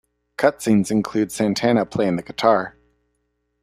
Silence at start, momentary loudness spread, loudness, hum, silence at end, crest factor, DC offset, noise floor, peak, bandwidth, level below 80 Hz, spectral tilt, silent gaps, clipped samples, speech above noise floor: 0.4 s; 5 LU; -20 LUFS; 60 Hz at -40 dBFS; 0.95 s; 20 dB; under 0.1%; -72 dBFS; 0 dBFS; 15 kHz; -56 dBFS; -5.5 dB/octave; none; under 0.1%; 52 dB